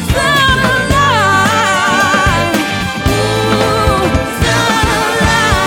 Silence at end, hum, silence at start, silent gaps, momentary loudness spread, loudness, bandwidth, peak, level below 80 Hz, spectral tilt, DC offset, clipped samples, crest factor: 0 s; none; 0 s; none; 4 LU; -11 LUFS; 17.5 kHz; 0 dBFS; -24 dBFS; -4 dB/octave; under 0.1%; under 0.1%; 12 dB